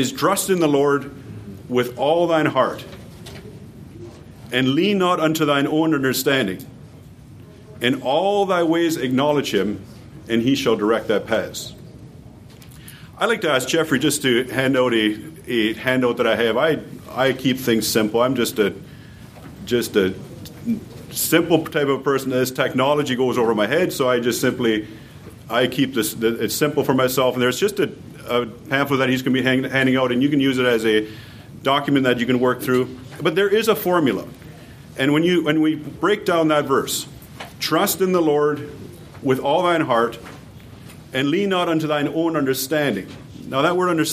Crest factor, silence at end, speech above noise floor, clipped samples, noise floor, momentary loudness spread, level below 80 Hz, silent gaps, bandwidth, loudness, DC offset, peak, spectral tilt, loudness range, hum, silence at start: 18 dB; 0 s; 23 dB; under 0.1%; -42 dBFS; 19 LU; -54 dBFS; none; 15.5 kHz; -19 LUFS; under 0.1%; -2 dBFS; -4.5 dB/octave; 3 LU; none; 0 s